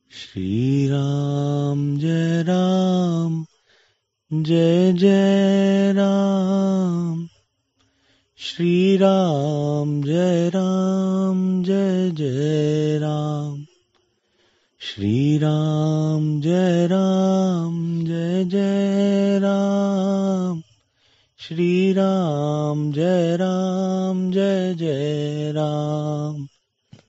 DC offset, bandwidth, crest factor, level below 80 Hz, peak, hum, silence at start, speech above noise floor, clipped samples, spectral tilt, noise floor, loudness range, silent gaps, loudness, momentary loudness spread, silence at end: under 0.1%; 8 kHz; 16 dB; -64 dBFS; -4 dBFS; none; 0.15 s; 48 dB; under 0.1%; -7.5 dB/octave; -66 dBFS; 4 LU; none; -20 LUFS; 9 LU; 0.6 s